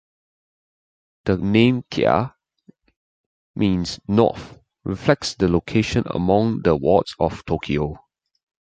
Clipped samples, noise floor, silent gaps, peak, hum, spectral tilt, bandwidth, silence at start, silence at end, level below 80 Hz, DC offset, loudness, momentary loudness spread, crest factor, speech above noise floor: under 0.1%; -55 dBFS; 2.97-3.54 s; -2 dBFS; none; -6.5 dB/octave; 9.2 kHz; 1.25 s; 0.65 s; -42 dBFS; under 0.1%; -20 LUFS; 12 LU; 20 dB; 36 dB